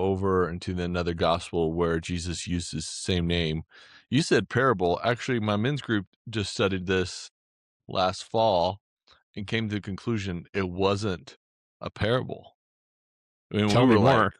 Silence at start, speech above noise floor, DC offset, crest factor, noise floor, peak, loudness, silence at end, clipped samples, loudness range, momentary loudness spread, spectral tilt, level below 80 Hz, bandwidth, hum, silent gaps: 0 s; over 64 dB; under 0.1%; 18 dB; under -90 dBFS; -8 dBFS; -26 LUFS; 0.1 s; under 0.1%; 4 LU; 11 LU; -5.5 dB/octave; -54 dBFS; 11 kHz; none; 6.07-6.25 s, 7.31-7.80 s, 8.81-8.97 s, 9.23-9.34 s, 10.49-10.53 s, 11.36-11.80 s, 12.55-13.50 s